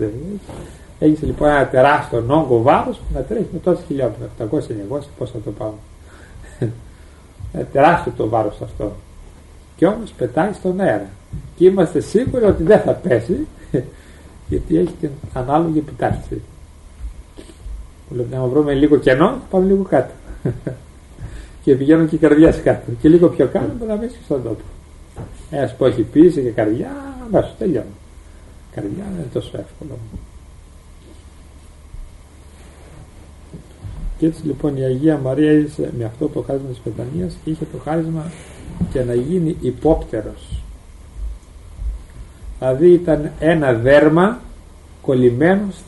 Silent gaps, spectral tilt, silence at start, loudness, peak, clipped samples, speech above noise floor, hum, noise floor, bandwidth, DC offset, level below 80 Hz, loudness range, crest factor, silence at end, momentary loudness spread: none; -8 dB/octave; 0 s; -17 LUFS; 0 dBFS; under 0.1%; 25 dB; none; -41 dBFS; 11.5 kHz; under 0.1%; -36 dBFS; 11 LU; 18 dB; 0 s; 21 LU